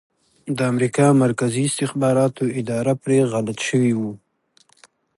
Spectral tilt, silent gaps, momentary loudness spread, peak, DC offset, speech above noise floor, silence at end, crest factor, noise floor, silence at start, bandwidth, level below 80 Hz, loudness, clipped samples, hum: -6 dB/octave; none; 9 LU; -4 dBFS; under 0.1%; 40 dB; 1 s; 16 dB; -59 dBFS; 0.45 s; 11.5 kHz; -62 dBFS; -20 LUFS; under 0.1%; none